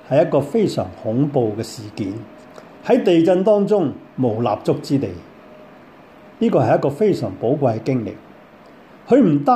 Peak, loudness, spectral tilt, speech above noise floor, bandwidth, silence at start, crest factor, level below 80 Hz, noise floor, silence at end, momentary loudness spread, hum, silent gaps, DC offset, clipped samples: -4 dBFS; -18 LUFS; -8 dB/octave; 27 dB; 13.5 kHz; 0.1 s; 16 dB; -60 dBFS; -44 dBFS; 0 s; 14 LU; none; none; under 0.1%; under 0.1%